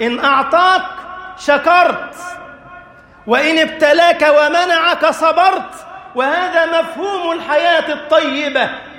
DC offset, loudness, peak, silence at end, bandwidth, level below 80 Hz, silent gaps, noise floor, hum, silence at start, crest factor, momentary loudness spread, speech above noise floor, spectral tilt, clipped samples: under 0.1%; -13 LUFS; 0 dBFS; 0 s; 16 kHz; -54 dBFS; none; -40 dBFS; none; 0 s; 14 dB; 17 LU; 26 dB; -2.5 dB/octave; under 0.1%